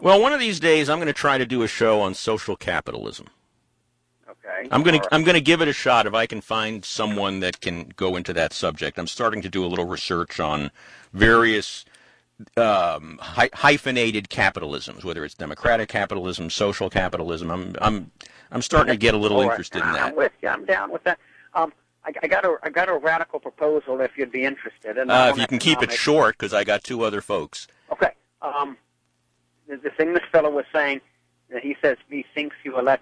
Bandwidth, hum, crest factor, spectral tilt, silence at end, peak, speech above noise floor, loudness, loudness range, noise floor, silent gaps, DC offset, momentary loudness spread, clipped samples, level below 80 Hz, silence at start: 10.5 kHz; none; 20 dB; -4.5 dB/octave; 0.05 s; -2 dBFS; 48 dB; -22 LUFS; 5 LU; -69 dBFS; none; under 0.1%; 14 LU; under 0.1%; -44 dBFS; 0 s